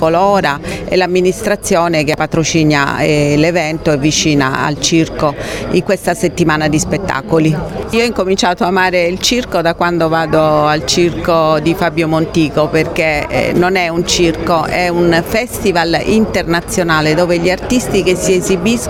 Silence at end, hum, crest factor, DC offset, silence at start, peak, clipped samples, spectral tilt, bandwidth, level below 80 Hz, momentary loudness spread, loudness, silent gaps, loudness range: 0 s; none; 12 dB; under 0.1%; 0 s; 0 dBFS; under 0.1%; -4.5 dB/octave; 17 kHz; -34 dBFS; 4 LU; -13 LUFS; none; 1 LU